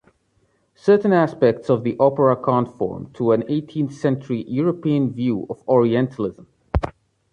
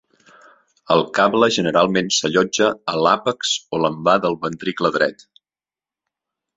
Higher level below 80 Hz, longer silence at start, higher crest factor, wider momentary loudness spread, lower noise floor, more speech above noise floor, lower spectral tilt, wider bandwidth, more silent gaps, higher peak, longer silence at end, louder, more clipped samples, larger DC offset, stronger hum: first, -40 dBFS vs -60 dBFS; about the same, 0.85 s vs 0.9 s; about the same, 18 dB vs 18 dB; first, 10 LU vs 6 LU; second, -64 dBFS vs under -90 dBFS; second, 45 dB vs over 72 dB; first, -9 dB/octave vs -3.5 dB/octave; about the same, 9 kHz vs 8.2 kHz; neither; about the same, -4 dBFS vs -2 dBFS; second, 0.4 s vs 1.45 s; about the same, -20 LUFS vs -18 LUFS; neither; neither; neither